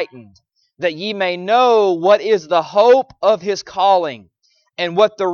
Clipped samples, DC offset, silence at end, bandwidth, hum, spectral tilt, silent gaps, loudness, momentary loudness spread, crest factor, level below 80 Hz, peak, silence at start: under 0.1%; under 0.1%; 0 s; 7 kHz; none; -4.5 dB/octave; none; -15 LUFS; 11 LU; 14 dB; -64 dBFS; -2 dBFS; 0 s